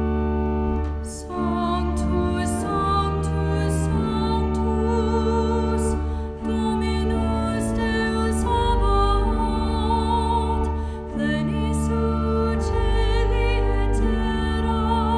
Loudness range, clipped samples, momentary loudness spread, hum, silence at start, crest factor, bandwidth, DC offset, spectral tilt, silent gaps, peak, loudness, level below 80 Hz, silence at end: 1 LU; under 0.1%; 4 LU; none; 0 s; 12 dB; 11 kHz; under 0.1%; -6.5 dB/octave; none; -8 dBFS; -23 LUFS; -26 dBFS; 0 s